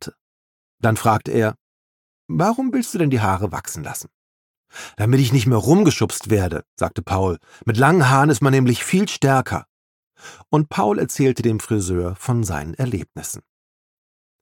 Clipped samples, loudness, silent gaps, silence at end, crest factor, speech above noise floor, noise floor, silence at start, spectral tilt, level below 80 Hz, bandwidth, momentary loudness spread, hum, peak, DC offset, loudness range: under 0.1%; -19 LUFS; 0.21-0.78 s, 1.61-2.29 s, 4.14-4.64 s, 6.67-6.77 s, 9.69-10.11 s; 1 s; 18 dB; over 72 dB; under -90 dBFS; 0 s; -6 dB/octave; -48 dBFS; 17.5 kHz; 13 LU; none; -2 dBFS; under 0.1%; 5 LU